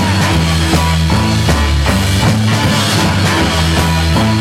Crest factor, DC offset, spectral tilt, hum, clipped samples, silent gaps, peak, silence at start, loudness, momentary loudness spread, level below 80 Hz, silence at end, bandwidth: 10 dB; under 0.1%; -5 dB/octave; none; under 0.1%; none; -2 dBFS; 0 s; -12 LUFS; 1 LU; -20 dBFS; 0 s; 16 kHz